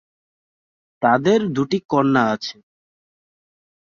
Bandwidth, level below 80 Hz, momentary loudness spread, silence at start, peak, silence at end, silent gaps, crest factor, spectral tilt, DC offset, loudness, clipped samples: 7.2 kHz; -62 dBFS; 7 LU; 1 s; -4 dBFS; 1.35 s; 1.85-1.89 s; 18 dB; -6.5 dB/octave; under 0.1%; -19 LUFS; under 0.1%